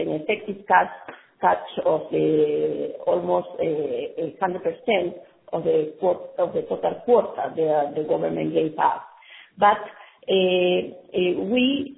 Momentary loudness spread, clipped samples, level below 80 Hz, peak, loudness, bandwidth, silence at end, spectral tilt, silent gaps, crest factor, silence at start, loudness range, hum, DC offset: 8 LU; under 0.1%; -64 dBFS; -4 dBFS; -23 LUFS; 4 kHz; 0 s; -9.5 dB/octave; none; 18 dB; 0 s; 2 LU; none; under 0.1%